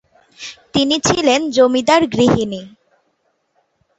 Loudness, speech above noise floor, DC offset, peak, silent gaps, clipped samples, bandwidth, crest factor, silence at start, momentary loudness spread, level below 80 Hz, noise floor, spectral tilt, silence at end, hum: -15 LUFS; 51 dB; under 0.1%; -2 dBFS; none; under 0.1%; 8.2 kHz; 16 dB; 0.4 s; 19 LU; -48 dBFS; -65 dBFS; -4 dB/octave; 1.3 s; none